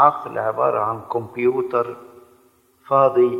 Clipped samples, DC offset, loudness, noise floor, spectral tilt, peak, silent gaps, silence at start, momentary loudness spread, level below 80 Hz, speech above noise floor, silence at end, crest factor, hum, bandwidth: under 0.1%; under 0.1%; -20 LUFS; -57 dBFS; -8.5 dB/octave; 0 dBFS; none; 0 s; 10 LU; -68 dBFS; 38 dB; 0 s; 20 dB; none; 5 kHz